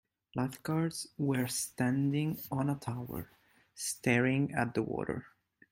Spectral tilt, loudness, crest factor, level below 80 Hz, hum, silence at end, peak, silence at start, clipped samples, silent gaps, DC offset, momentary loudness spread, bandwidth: -5.5 dB/octave; -34 LUFS; 22 dB; -66 dBFS; none; 0.45 s; -12 dBFS; 0.35 s; under 0.1%; none; under 0.1%; 11 LU; 16.5 kHz